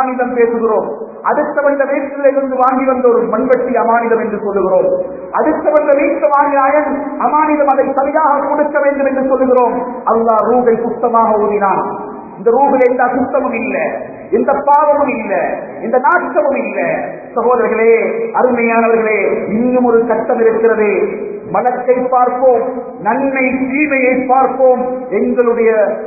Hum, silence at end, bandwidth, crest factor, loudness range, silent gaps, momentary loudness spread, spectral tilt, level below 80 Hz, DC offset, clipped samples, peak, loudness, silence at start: none; 0 s; 2.7 kHz; 12 dB; 2 LU; none; 6 LU; -10.5 dB/octave; -50 dBFS; under 0.1%; under 0.1%; 0 dBFS; -13 LUFS; 0 s